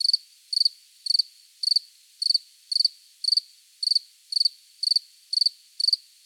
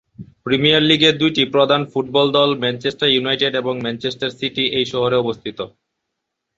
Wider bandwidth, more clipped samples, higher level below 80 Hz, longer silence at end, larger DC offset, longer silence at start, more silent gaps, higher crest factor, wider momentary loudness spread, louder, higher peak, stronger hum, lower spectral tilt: first, 16.5 kHz vs 8 kHz; neither; second, under -90 dBFS vs -56 dBFS; second, 0.3 s vs 0.9 s; neither; second, 0 s vs 0.2 s; neither; about the same, 18 dB vs 18 dB; second, 6 LU vs 11 LU; second, -23 LUFS vs -17 LUFS; second, -10 dBFS vs -2 dBFS; neither; second, 12 dB/octave vs -5.5 dB/octave